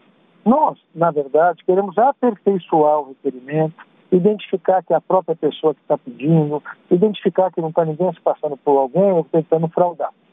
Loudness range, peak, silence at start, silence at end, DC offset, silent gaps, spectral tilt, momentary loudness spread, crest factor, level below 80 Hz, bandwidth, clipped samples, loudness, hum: 2 LU; -4 dBFS; 0.45 s; 0.25 s; under 0.1%; none; -10.5 dB/octave; 6 LU; 14 dB; -68 dBFS; 3.8 kHz; under 0.1%; -18 LUFS; none